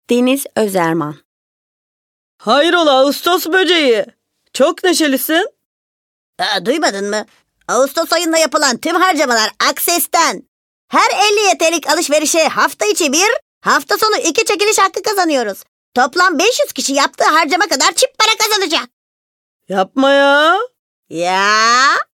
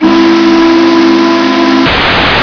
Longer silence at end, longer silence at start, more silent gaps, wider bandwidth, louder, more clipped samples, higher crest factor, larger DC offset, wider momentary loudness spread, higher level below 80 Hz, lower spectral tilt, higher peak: first, 0.15 s vs 0 s; about the same, 0.1 s vs 0 s; first, 1.25-2.39 s, 5.66-6.33 s, 10.48-10.88 s, 13.42-13.61 s, 15.68-15.92 s, 18.93-19.60 s, 20.79-21.03 s vs none; first, 19.5 kHz vs 5.4 kHz; second, -13 LUFS vs -6 LUFS; second, under 0.1% vs 4%; first, 14 dB vs 6 dB; neither; first, 8 LU vs 2 LU; second, -68 dBFS vs -30 dBFS; second, -1.5 dB/octave vs -5 dB/octave; about the same, 0 dBFS vs 0 dBFS